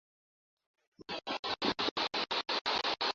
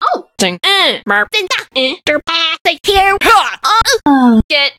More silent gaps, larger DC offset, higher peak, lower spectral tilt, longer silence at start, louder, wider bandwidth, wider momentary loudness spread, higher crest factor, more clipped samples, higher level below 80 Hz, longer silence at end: about the same, 1.39-1.43 s, 1.91-1.96 s, 2.61-2.65 s vs 2.61-2.65 s, 4.44-4.49 s; neither; second, -20 dBFS vs 0 dBFS; second, 0.5 dB/octave vs -2.5 dB/octave; first, 1 s vs 0 s; second, -34 LUFS vs -11 LUFS; second, 7.6 kHz vs 16.5 kHz; about the same, 7 LU vs 6 LU; first, 18 dB vs 12 dB; neither; second, -70 dBFS vs -34 dBFS; about the same, 0 s vs 0.05 s